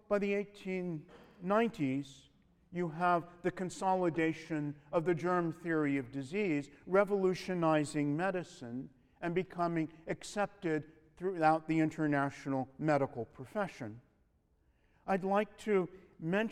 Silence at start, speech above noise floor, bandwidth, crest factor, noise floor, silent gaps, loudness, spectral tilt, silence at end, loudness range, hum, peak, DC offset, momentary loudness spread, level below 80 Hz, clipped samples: 0.1 s; 38 dB; 12.5 kHz; 20 dB; -72 dBFS; none; -35 LUFS; -7 dB/octave; 0 s; 4 LU; none; -16 dBFS; under 0.1%; 11 LU; -68 dBFS; under 0.1%